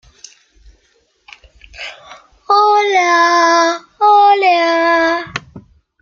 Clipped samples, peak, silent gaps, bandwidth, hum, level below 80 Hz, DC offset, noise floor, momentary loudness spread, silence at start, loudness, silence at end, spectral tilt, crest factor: under 0.1%; -2 dBFS; none; 7.4 kHz; none; -52 dBFS; under 0.1%; -58 dBFS; 19 LU; 1.8 s; -11 LUFS; 0.4 s; -2.5 dB/octave; 14 dB